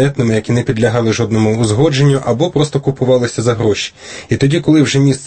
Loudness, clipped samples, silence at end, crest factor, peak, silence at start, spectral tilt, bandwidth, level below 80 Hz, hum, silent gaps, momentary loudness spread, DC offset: -13 LUFS; under 0.1%; 0 s; 12 dB; 0 dBFS; 0 s; -6 dB/octave; 8.8 kHz; -42 dBFS; none; none; 5 LU; under 0.1%